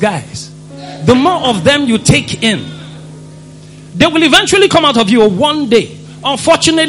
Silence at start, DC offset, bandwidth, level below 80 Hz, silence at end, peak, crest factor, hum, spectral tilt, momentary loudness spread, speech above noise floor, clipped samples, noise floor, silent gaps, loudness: 0 s; under 0.1%; 15 kHz; -40 dBFS; 0 s; 0 dBFS; 12 dB; none; -4 dB/octave; 21 LU; 23 dB; 0.4%; -33 dBFS; none; -10 LUFS